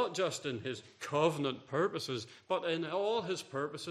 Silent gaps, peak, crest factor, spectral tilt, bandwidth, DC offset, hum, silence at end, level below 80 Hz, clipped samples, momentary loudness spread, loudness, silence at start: none; -16 dBFS; 20 dB; -4.5 dB/octave; 14 kHz; under 0.1%; none; 0 s; -78 dBFS; under 0.1%; 8 LU; -36 LUFS; 0 s